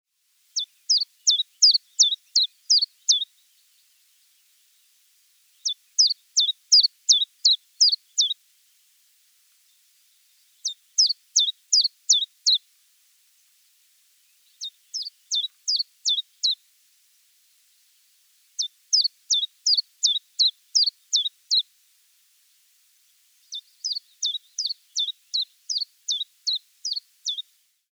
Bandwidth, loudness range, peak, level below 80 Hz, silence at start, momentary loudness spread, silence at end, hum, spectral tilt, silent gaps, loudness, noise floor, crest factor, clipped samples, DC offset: over 20 kHz; 10 LU; -6 dBFS; under -90 dBFS; 0.55 s; 13 LU; 0.55 s; none; 11 dB/octave; none; -21 LUFS; -66 dBFS; 20 dB; under 0.1%; under 0.1%